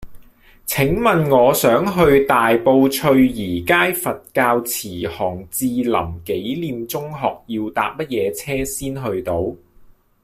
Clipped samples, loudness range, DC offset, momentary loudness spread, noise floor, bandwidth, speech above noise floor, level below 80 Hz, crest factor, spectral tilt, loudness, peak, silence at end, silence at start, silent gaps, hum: under 0.1%; 8 LU; under 0.1%; 11 LU; -48 dBFS; 16 kHz; 30 dB; -42 dBFS; 16 dB; -5 dB/octave; -18 LUFS; -2 dBFS; 0.7 s; 0 s; none; none